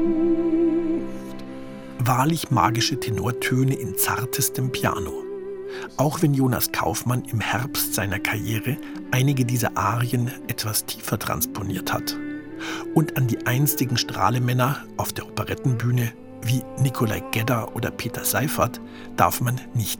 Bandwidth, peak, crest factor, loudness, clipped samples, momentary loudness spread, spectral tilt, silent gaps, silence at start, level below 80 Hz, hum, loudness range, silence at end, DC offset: 19.5 kHz; -2 dBFS; 22 dB; -23 LUFS; under 0.1%; 11 LU; -5 dB/octave; none; 0 s; -50 dBFS; none; 2 LU; 0 s; under 0.1%